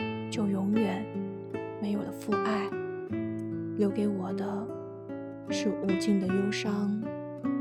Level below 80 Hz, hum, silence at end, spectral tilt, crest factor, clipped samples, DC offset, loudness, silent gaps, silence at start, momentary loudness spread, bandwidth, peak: -66 dBFS; none; 0 s; -6.5 dB/octave; 16 dB; under 0.1%; under 0.1%; -32 LUFS; none; 0 s; 10 LU; 13.5 kHz; -14 dBFS